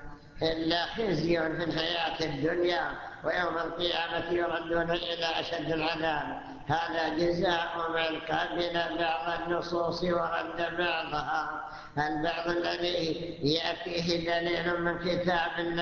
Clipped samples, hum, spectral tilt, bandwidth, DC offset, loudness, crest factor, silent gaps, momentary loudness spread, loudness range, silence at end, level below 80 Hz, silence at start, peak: under 0.1%; none; -5.5 dB/octave; 7 kHz; under 0.1%; -30 LUFS; 18 dB; none; 4 LU; 1 LU; 0 s; -54 dBFS; 0 s; -12 dBFS